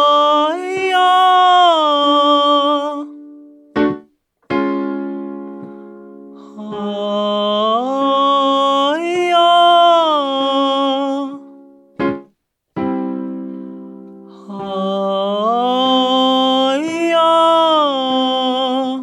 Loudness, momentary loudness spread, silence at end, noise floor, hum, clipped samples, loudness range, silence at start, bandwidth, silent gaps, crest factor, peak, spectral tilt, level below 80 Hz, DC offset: -14 LUFS; 18 LU; 0 s; -61 dBFS; none; under 0.1%; 11 LU; 0 s; 12.5 kHz; none; 14 dB; -2 dBFS; -4.5 dB/octave; -62 dBFS; under 0.1%